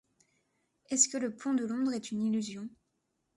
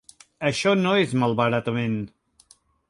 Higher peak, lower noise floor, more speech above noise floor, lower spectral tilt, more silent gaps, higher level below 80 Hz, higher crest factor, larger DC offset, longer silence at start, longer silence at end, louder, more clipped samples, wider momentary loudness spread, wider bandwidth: second, -10 dBFS vs -6 dBFS; first, -80 dBFS vs -58 dBFS; first, 48 dB vs 36 dB; second, -3 dB/octave vs -5.5 dB/octave; neither; second, -78 dBFS vs -60 dBFS; first, 24 dB vs 18 dB; neither; first, 0.9 s vs 0.4 s; about the same, 0.7 s vs 0.8 s; second, -31 LUFS vs -23 LUFS; neither; first, 14 LU vs 8 LU; about the same, 11.5 kHz vs 11.5 kHz